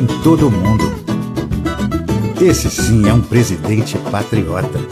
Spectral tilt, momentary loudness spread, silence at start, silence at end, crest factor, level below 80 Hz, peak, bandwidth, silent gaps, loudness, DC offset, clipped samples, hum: -6 dB/octave; 8 LU; 0 s; 0 s; 14 dB; -28 dBFS; 0 dBFS; 15.5 kHz; none; -15 LUFS; under 0.1%; under 0.1%; none